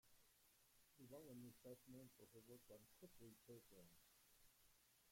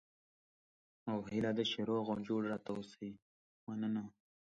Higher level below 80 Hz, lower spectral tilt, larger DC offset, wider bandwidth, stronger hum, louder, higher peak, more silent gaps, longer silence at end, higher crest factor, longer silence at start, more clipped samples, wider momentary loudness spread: second, -86 dBFS vs -74 dBFS; about the same, -5 dB/octave vs -6 dB/octave; neither; first, 16.5 kHz vs 7.8 kHz; neither; second, -65 LUFS vs -40 LUFS; second, -50 dBFS vs -24 dBFS; second, none vs 3.22-3.67 s; second, 0 s vs 0.5 s; about the same, 16 dB vs 18 dB; second, 0.05 s vs 1.05 s; neither; second, 6 LU vs 14 LU